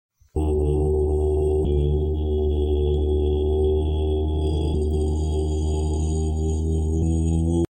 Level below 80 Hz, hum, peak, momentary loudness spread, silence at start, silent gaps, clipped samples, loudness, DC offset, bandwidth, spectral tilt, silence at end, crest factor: -24 dBFS; none; -10 dBFS; 3 LU; 0.35 s; none; under 0.1%; -23 LUFS; under 0.1%; 9 kHz; -8.5 dB/octave; 0.05 s; 12 dB